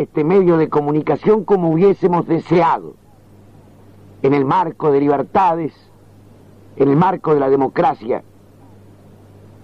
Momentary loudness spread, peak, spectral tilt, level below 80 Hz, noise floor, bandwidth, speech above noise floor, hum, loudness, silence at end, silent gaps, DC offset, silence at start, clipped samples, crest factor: 7 LU; -2 dBFS; -9.5 dB/octave; -52 dBFS; -45 dBFS; 6.4 kHz; 31 dB; none; -16 LUFS; 1.4 s; none; 0.2%; 0 s; under 0.1%; 14 dB